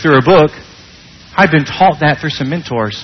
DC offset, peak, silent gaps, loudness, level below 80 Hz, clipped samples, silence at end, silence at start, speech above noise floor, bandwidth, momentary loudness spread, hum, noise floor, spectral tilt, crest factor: under 0.1%; 0 dBFS; none; -12 LUFS; -42 dBFS; under 0.1%; 0 s; 0 s; 27 dB; 6.4 kHz; 10 LU; none; -38 dBFS; -6.5 dB/octave; 12 dB